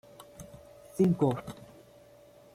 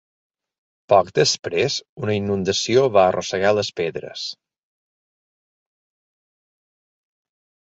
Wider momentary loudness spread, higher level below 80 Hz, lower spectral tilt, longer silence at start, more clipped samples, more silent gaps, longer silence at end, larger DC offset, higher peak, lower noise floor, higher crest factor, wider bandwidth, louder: first, 25 LU vs 11 LU; second, -64 dBFS vs -56 dBFS; first, -8.5 dB/octave vs -4 dB/octave; second, 0.2 s vs 0.9 s; neither; second, none vs 1.39-1.43 s, 1.89-1.97 s; second, 0.9 s vs 3.4 s; neither; second, -14 dBFS vs -2 dBFS; second, -56 dBFS vs under -90 dBFS; about the same, 20 dB vs 20 dB; first, 15 kHz vs 8 kHz; second, -29 LUFS vs -20 LUFS